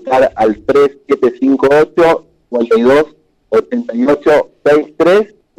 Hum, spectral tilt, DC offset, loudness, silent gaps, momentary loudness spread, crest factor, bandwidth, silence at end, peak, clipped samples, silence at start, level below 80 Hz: none; -6 dB/octave; under 0.1%; -12 LUFS; none; 6 LU; 8 dB; 11.5 kHz; 0.35 s; -2 dBFS; under 0.1%; 0.05 s; -46 dBFS